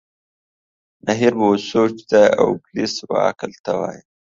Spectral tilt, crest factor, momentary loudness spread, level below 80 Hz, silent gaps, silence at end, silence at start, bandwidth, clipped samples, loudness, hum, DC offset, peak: -5 dB/octave; 18 dB; 10 LU; -58 dBFS; 3.59-3.64 s; 0.35 s; 1.05 s; 7.6 kHz; under 0.1%; -18 LUFS; none; under 0.1%; 0 dBFS